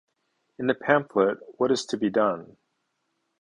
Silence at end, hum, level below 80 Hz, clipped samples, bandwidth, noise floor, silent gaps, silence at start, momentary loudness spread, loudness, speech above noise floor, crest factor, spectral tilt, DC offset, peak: 1 s; none; -68 dBFS; under 0.1%; 11 kHz; -76 dBFS; none; 0.6 s; 6 LU; -25 LUFS; 52 dB; 24 dB; -5 dB/octave; under 0.1%; -4 dBFS